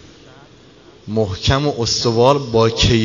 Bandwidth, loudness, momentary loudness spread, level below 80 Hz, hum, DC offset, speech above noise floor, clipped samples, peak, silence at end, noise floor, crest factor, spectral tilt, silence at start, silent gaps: 7.6 kHz; -16 LUFS; 7 LU; -34 dBFS; none; 0.1%; 29 dB; under 0.1%; 0 dBFS; 0 s; -45 dBFS; 18 dB; -5 dB/octave; 1.05 s; none